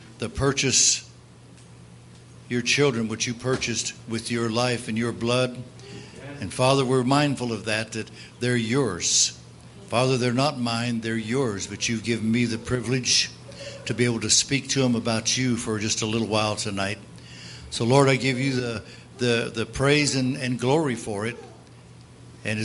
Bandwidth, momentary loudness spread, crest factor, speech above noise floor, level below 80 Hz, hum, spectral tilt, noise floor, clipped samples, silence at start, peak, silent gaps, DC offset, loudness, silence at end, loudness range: 11.5 kHz; 15 LU; 22 dB; 24 dB; -54 dBFS; none; -3.5 dB/octave; -48 dBFS; under 0.1%; 0 s; -4 dBFS; none; under 0.1%; -23 LUFS; 0 s; 3 LU